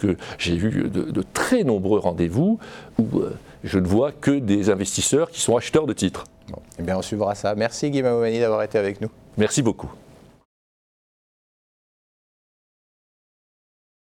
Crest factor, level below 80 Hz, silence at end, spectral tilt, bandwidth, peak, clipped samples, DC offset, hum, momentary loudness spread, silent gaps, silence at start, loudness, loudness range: 18 dB; -50 dBFS; 4.1 s; -5 dB/octave; 17.5 kHz; -6 dBFS; under 0.1%; under 0.1%; none; 10 LU; none; 0 s; -22 LUFS; 6 LU